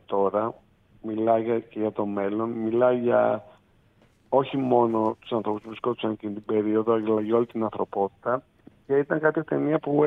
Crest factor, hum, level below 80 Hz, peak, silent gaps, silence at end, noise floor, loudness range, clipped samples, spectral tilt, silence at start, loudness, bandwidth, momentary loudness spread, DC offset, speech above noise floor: 18 dB; none; -66 dBFS; -8 dBFS; none; 0 s; -60 dBFS; 2 LU; under 0.1%; -9.5 dB/octave; 0.1 s; -25 LUFS; 3.9 kHz; 8 LU; under 0.1%; 36 dB